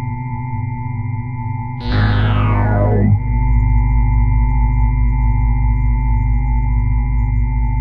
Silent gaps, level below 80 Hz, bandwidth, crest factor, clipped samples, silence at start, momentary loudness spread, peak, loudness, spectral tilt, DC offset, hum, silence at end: none; -16 dBFS; 4.8 kHz; 12 dB; under 0.1%; 0 s; 8 LU; -4 dBFS; -17 LUFS; -10 dB/octave; 0.7%; none; 0 s